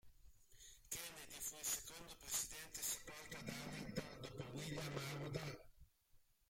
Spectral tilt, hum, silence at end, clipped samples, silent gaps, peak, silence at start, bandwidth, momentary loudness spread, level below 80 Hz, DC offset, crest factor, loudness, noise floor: -3 dB/octave; none; 0.25 s; under 0.1%; none; -28 dBFS; 0.05 s; 16.5 kHz; 11 LU; -68 dBFS; under 0.1%; 22 dB; -47 LUFS; -73 dBFS